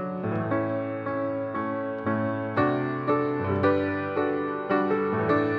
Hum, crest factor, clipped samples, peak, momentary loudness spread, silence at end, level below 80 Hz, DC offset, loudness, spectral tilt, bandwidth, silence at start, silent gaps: none; 16 dB; under 0.1%; -10 dBFS; 6 LU; 0 s; -64 dBFS; under 0.1%; -27 LUFS; -9.5 dB/octave; 5.4 kHz; 0 s; none